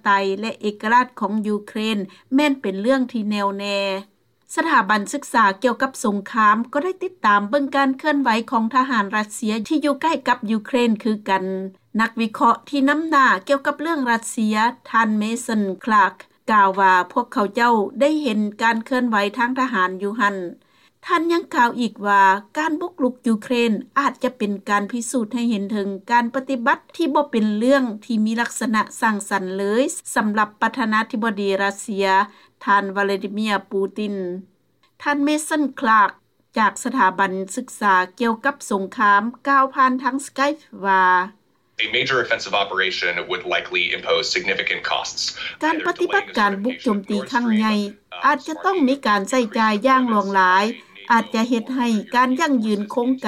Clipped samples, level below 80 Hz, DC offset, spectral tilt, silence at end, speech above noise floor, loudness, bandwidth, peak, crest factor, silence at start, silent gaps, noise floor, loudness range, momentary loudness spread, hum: under 0.1%; -66 dBFS; under 0.1%; -4 dB/octave; 0 s; 42 dB; -20 LUFS; 15.5 kHz; -4 dBFS; 16 dB; 0.05 s; none; -61 dBFS; 3 LU; 7 LU; none